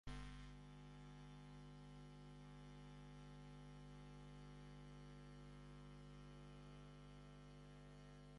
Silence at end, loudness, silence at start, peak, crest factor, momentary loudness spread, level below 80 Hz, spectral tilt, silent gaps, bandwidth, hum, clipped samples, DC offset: 0 s; -61 LUFS; 0.05 s; -40 dBFS; 20 dB; 2 LU; -66 dBFS; -6 dB/octave; none; 11 kHz; 50 Hz at -60 dBFS; under 0.1%; under 0.1%